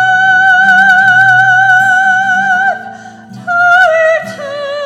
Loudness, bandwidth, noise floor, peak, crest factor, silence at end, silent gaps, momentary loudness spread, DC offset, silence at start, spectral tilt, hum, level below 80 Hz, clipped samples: -7 LUFS; 13 kHz; -30 dBFS; 0 dBFS; 8 dB; 0 s; none; 15 LU; under 0.1%; 0 s; -3 dB/octave; none; -56 dBFS; 0.2%